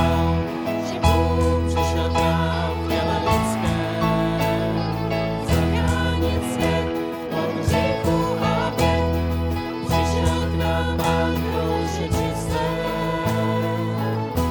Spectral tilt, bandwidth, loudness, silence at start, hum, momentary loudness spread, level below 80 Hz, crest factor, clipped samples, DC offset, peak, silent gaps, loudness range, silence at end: -6 dB/octave; over 20 kHz; -22 LUFS; 0 s; none; 4 LU; -32 dBFS; 18 dB; under 0.1%; under 0.1%; -2 dBFS; none; 2 LU; 0 s